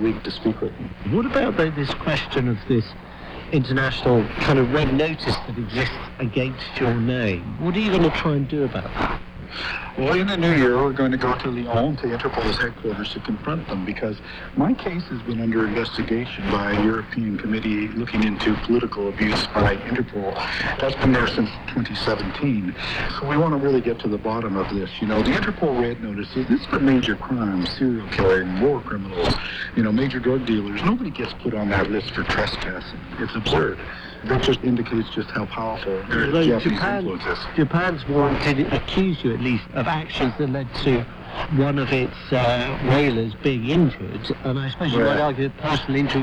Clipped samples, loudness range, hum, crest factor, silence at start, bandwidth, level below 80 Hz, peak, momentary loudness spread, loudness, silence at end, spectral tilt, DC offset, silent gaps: under 0.1%; 3 LU; none; 16 dB; 0 s; 9.8 kHz; -38 dBFS; -6 dBFS; 8 LU; -22 LUFS; 0 s; -7 dB/octave; under 0.1%; none